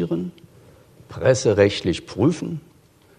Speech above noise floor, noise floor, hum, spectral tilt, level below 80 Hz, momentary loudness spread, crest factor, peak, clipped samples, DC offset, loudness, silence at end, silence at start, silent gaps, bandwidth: 30 dB; -50 dBFS; none; -5.5 dB/octave; -52 dBFS; 17 LU; 20 dB; -2 dBFS; under 0.1%; under 0.1%; -21 LUFS; 0.6 s; 0 s; none; 10.5 kHz